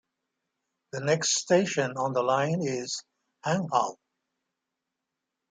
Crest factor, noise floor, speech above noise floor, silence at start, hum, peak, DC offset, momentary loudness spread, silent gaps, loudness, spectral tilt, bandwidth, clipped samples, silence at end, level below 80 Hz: 20 dB; -85 dBFS; 59 dB; 0.95 s; none; -10 dBFS; under 0.1%; 11 LU; none; -27 LUFS; -4 dB/octave; 10 kHz; under 0.1%; 1.6 s; -74 dBFS